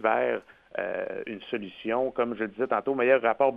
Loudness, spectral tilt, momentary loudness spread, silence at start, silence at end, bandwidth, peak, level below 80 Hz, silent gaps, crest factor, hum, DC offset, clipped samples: -28 LUFS; -7.5 dB/octave; 12 LU; 0 s; 0 s; 4.9 kHz; -8 dBFS; -68 dBFS; none; 20 dB; none; under 0.1%; under 0.1%